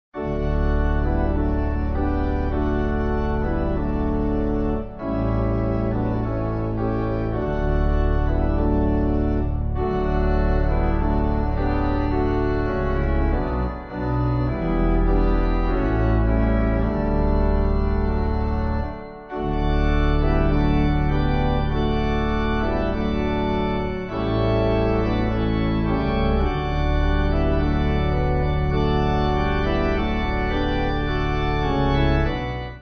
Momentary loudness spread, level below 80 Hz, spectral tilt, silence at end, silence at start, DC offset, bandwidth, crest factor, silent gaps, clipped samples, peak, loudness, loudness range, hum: 4 LU; -24 dBFS; -9 dB/octave; 0 s; 0.15 s; under 0.1%; 6.2 kHz; 14 dB; none; under 0.1%; -6 dBFS; -23 LUFS; 2 LU; none